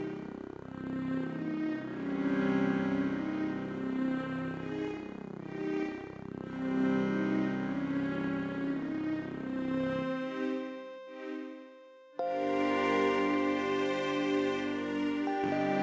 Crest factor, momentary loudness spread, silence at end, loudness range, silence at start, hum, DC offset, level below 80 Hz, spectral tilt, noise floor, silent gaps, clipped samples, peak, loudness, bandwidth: 16 dB; 13 LU; 0 s; 6 LU; 0 s; none; under 0.1%; -64 dBFS; -7 dB/octave; -54 dBFS; none; under 0.1%; -18 dBFS; -34 LUFS; 8 kHz